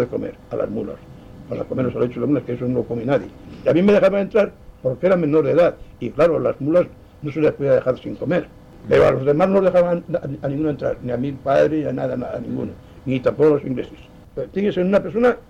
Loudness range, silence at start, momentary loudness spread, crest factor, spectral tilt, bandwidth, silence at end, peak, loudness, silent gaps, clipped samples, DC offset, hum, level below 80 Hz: 4 LU; 0 s; 13 LU; 12 dB; -8.5 dB/octave; 8.4 kHz; 0.1 s; -8 dBFS; -20 LUFS; none; under 0.1%; under 0.1%; none; -46 dBFS